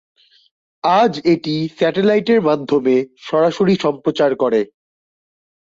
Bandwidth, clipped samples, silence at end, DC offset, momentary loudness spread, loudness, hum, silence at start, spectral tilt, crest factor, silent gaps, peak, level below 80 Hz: 7.6 kHz; under 0.1%; 1.15 s; under 0.1%; 6 LU; -16 LUFS; none; 0.85 s; -6.5 dB/octave; 14 dB; none; -2 dBFS; -60 dBFS